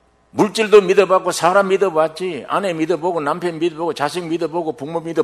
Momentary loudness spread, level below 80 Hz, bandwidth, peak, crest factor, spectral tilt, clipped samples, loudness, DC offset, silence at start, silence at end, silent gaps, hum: 11 LU; -62 dBFS; 13.5 kHz; 0 dBFS; 18 dB; -5 dB/octave; under 0.1%; -17 LUFS; under 0.1%; 0.35 s; 0 s; none; none